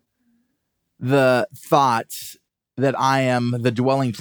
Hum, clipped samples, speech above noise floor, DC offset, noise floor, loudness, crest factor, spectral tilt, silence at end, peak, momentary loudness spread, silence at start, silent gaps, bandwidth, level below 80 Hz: none; under 0.1%; 55 dB; under 0.1%; -74 dBFS; -20 LUFS; 20 dB; -6 dB/octave; 0 s; -2 dBFS; 15 LU; 1 s; none; over 20 kHz; -72 dBFS